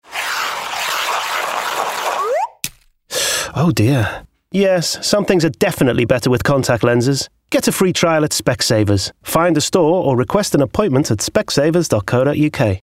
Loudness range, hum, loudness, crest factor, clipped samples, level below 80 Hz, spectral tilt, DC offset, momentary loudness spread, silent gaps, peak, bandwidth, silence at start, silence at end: 3 LU; none; -16 LUFS; 14 dB; under 0.1%; -44 dBFS; -4.5 dB/octave; under 0.1%; 6 LU; none; -2 dBFS; 16.5 kHz; 0.1 s; 0.05 s